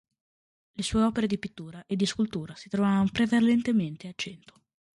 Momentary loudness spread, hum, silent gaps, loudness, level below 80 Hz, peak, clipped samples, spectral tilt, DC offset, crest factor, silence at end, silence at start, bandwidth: 14 LU; none; none; -27 LUFS; -54 dBFS; -12 dBFS; under 0.1%; -5.5 dB/octave; under 0.1%; 16 dB; 0.6 s; 0.8 s; 11.5 kHz